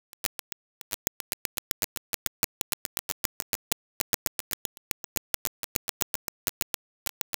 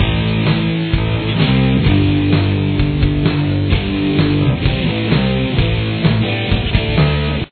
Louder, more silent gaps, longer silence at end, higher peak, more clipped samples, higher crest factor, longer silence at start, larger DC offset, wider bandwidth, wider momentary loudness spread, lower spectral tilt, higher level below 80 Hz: second, -33 LUFS vs -15 LUFS; first, 0.26-6.47 s vs none; first, 0.85 s vs 0.05 s; about the same, 0 dBFS vs 0 dBFS; neither; first, 36 dB vs 14 dB; first, 0.25 s vs 0 s; neither; first, over 20 kHz vs 4.5 kHz; about the same, 5 LU vs 4 LU; second, -0.5 dB/octave vs -10 dB/octave; second, -58 dBFS vs -24 dBFS